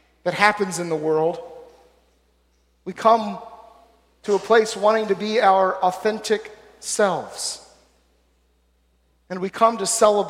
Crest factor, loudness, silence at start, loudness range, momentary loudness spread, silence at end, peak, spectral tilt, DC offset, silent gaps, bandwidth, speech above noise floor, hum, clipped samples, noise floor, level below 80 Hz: 20 dB; -20 LUFS; 0.25 s; 6 LU; 18 LU; 0 s; -2 dBFS; -3 dB/octave; under 0.1%; none; 16 kHz; 43 dB; none; under 0.1%; -63 dBFS; -62 dBFS